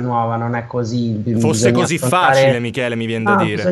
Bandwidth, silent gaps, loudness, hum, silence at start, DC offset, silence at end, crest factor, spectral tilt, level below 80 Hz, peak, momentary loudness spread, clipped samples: 12.5 kHz; none; -16 LUFS; none; 0 s; under 0.1%; 0 s; 16 dB; -5.5 dB/octave; -54 dBFS; 0 dBFS; 8 LU; under 0.1%